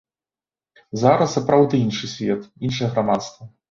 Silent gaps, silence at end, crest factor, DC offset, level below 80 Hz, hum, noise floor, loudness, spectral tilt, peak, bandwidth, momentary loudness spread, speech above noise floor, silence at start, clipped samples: none; 0.2 s; 20 dB; under 0.1%; -56 dBFS; none; under -90 dBFS; -20 LUFS; -6 dB/octave; -2 dBFS; 7.6 kHz; 9 LU; over 70 dB; 0.95 s; under 0.1%